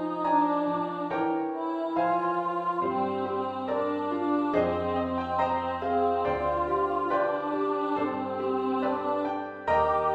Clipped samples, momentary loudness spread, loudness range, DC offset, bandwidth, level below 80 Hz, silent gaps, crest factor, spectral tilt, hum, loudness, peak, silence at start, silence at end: under 0.1%; 5 LU; 1 LU; under 0.1%; 8 kHz; -56 dBFS; none; 16 dB; -8 dB/octave; none; -28 LUFS; -12 dBFS; 0 s; 0 s